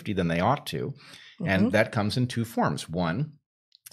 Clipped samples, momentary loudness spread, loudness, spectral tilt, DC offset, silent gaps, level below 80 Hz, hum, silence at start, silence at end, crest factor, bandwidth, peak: under 0.1%; 13 LU; -27 LUFS; -6 dB/octave; under 0.1%; none; -58 dBFS; none; 0 s; 0.6 s; 22 dB; 14.5 kHz; -6 dBFS